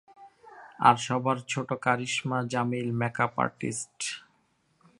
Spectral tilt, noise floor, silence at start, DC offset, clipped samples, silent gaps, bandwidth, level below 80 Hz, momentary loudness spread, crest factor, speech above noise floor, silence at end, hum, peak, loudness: -4.5 dB/octave; -70 dBFS; 0.2 s; under 0.1%; under 0.1%; none; 11.5 kHz; -68 dBFS; 11 LU; 24 dB; 42 dB; 0.8 s; none; -6 dBFS; -28 LUFS